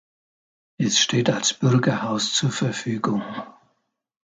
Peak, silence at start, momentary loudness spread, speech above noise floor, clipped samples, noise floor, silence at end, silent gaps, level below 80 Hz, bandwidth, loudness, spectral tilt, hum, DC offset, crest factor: -6 dBFS; 0.8 s; 10 LU; 50 dB; under 0.1%; -72 dBFS; 0.75 s; none; -64 dBFS; 9.6 kHz; -21 LUFS; -4 dB/octave; none; under 0.1%; 18 dB